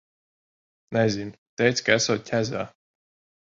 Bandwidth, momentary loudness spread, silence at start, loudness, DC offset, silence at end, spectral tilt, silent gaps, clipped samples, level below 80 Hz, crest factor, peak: 7.8 kHz; 12 LU; 0.9 s; -24 LUFS; under 0.1%; 0.75 s; -4 dB/octave; 1.38-1.57 s; under 0.1%; -60 dBFS; 22 dB; -4 dBFS